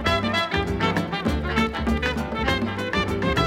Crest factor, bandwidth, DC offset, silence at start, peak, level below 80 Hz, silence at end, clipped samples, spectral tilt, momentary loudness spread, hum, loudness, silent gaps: 16 dB; 17 kHz; under 0.1%; 0 s; -8 dBFS; -34 dBFS; 0 s; under 0.1%; -5.5 dB/octave; 3 LU; none; -24 LUFS; none